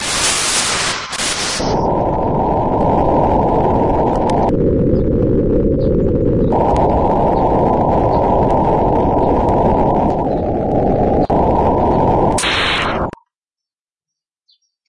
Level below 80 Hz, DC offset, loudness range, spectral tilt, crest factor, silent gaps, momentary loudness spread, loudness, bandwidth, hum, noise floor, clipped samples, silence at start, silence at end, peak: -26 dBFS; under 0.1%; 1 LU; -5 dB/octave; 12 dB; none; 3 LU; -14 LUFS; 11.5 kHz; none; -88 dBFS; under 0.1%; 0 s; 1.8 s; -2 dBFS